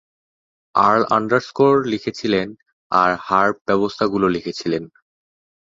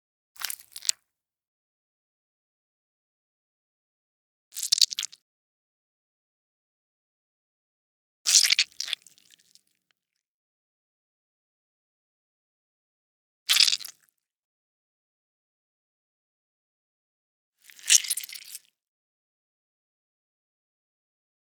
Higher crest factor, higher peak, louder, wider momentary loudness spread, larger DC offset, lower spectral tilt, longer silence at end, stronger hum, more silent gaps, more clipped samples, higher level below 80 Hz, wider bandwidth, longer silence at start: second, 18 dB vs 32 dB; about the same, -2 dBFS vs 0 dBFS; first, -19 LUFS vs -22 LUFS; second, 8 LU vs 21 LU; neither; first, -6 dB/octave vs 6.5 dB/octave; second, 0.75 s vs 3 s; neither; second, 2.73-2.90 s, 3.61-3.65 s vs 1.47-4.51 s, 5.22-8.25 s, 10.26-13.46 s, 14.36-17.53 s; neither; first, -56 dBFS vs under -90 dBFS; second, 7.6 kHz vs over 20 kHz; first, 0.75 s vs 0.4 s